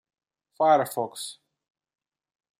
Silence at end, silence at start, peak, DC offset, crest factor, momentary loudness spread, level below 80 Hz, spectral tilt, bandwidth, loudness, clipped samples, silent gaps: 1.25 s; 0.6 s; -8 dBFS; under 0.1%; 20 dB; 16 LU; -82 dBFS; -4 dB/octave; 16 kHz; -24 LUFS; under 0.1%; none